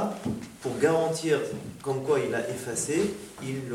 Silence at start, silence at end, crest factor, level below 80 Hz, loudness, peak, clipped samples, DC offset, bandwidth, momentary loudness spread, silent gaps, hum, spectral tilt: 0 s; 0 s; 18 dB; -64 dBFS; -29 LUFS; -10 dBFS; under 0.1%; under 0.1%; 16.5 kHz; 10 LU; none; none; -5 dB/octave